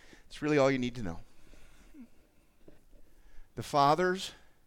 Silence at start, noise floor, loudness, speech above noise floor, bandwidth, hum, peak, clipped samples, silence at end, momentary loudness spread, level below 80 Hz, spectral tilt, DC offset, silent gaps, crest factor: 0.3 s; -60 dBFS; -30 LUFS; 31 dB; 16.5 kHz; none; -12 dBFS; under 0.1%; 0.3 s; 21 LU; -54 dBFS; -5.5 dB/octave; under 0.1%; none; 22 dB